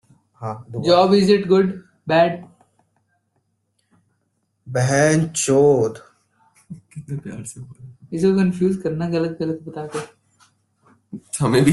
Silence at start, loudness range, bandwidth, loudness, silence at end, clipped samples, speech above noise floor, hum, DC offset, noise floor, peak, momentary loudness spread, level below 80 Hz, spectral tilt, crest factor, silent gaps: 0.4 s; 5 LU; 12 kHz; -19 LUFS; 0 s; under 0.1%; 51 dB; none; under 0.1%; -70 dBFS; -2 dBFS; 23 LU; -56 dBFS; -5.5 dB/octave; 18 dB; none